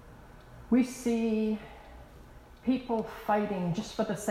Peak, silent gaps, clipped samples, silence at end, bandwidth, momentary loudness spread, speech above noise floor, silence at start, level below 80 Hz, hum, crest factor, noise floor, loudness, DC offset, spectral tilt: -16 dBFS; none; under 0.1%; 0 s; 15.5 kHz; 22 LU; 22 dB; 0 s; -54 dBFS; none; 16 dB; -51 dBFS; -31 LUFS; under 0.1%; -6 dB/octave